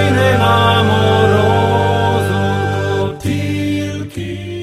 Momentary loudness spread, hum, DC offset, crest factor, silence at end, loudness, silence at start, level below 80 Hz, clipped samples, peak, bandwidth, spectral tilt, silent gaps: 11 LU; none; under 0.1%; 14 dB; 0 s; -14 LUFS; 0 s; -40 dBFS; under 0.1%; 0 dBFS; 14 kHz; -6 dB/octave; none